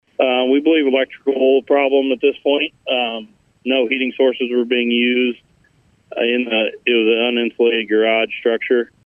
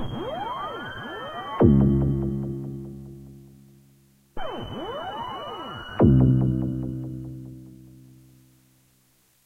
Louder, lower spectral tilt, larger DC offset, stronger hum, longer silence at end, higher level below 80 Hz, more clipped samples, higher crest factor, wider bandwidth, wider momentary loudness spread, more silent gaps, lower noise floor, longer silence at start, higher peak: first, -17 LUFS vs -25 LUFS; second, -6 dB/octave vs -9 dB/octave; neither; neither; second, 0.2 s vs 1.55 s; second, -68 dBFS vs -38 dBFS; neither; second, 14 dB vs 22 dB; about the same, 3.7 kHz vs 3.5 kHz; second, 5 LU vs 23 LU; neither; second, -56 dBFS vs -63 dBFS; first, 0.2 s vs 0 s; about the same, -2 dBFS vs -4 dBFS